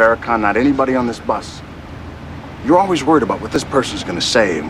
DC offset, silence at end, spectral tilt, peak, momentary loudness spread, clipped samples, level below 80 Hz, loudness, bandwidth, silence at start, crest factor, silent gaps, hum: 0.1%; 0 s; -4.5 dB/octave; 0 dBFS; 18 LU; under 0.1%; -40 dBFS; -16 LUFS; 13 kHz; 0 s; 16 dB; none; none